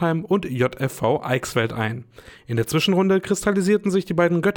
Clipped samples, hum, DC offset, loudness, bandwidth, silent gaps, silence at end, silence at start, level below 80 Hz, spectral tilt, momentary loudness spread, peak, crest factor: under 0.1%; none; under 0.1%; -21 LUFS; 19.5 kHz; none; 0 s; 0 s; -52 dBFS; -5.5 dB/octave; 7 LU; -6 dBFS; 14 dB